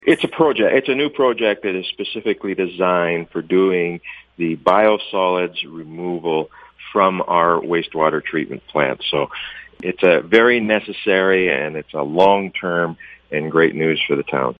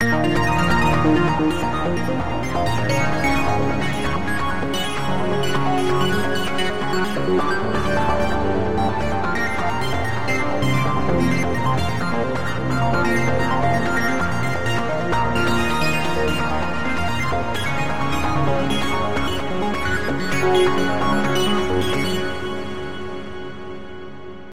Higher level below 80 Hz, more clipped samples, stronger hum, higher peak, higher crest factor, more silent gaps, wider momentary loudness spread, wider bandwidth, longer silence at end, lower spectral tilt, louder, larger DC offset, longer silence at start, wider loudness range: second, -56 dBFS vs -36 dBFS; neither; neither; first, 0 dBFS vs -6 dBFS; about the same, 18 dB vs 16 dB; neither; first, 11 LU vs 5 LU; second, 10 kHz vs 16 kHz; about the same, 0.05 s vs 0 s; first, -7 dB/octave vs -5.5 dB/octave; first, -18 LUFS vs -21 LUFS; second, under 0.1% vs 6%; about the same, 0.05 s vs 0 s; about the same, 3 LU vs 2 LU